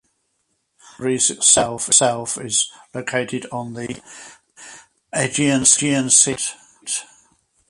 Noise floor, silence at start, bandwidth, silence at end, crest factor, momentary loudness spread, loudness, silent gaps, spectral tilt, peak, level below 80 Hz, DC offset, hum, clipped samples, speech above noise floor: -70 dBFS; 1 s; 11.5 kHz; 0.65 s; 22 dB; 17 LU; -17 LUFS; none; -2 dB/octave; 0 dBFS; -56 dBFS; under 0.1%; none; under 0.1%; 51 dB